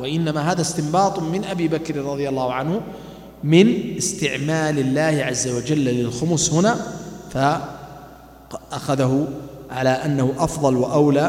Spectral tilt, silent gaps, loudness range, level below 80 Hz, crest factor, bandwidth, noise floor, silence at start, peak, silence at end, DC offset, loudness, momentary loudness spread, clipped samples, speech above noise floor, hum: -5 dB/octave; none; 4 LU; -48 dBFS; 20 dB; 16 kHz; -43 dBFS; 0 s; 0 dBFS; 0 s; under 0.1%; -20 LUFS; 15 LU; under 0.1%; 23 dB; none